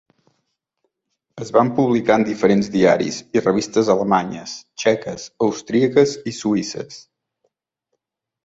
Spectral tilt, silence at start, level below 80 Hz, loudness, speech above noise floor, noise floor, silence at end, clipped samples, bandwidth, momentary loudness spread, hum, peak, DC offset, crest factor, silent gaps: -5.5 dB/octave; 1.35 s; -58 dBFS; -18 LUFS; 58 dB; -76 dBFS; 1.45 s; under 0.1%; 8 kHz; 13 LU; none; -2 dBFS; under 0.1%; 18 dB; none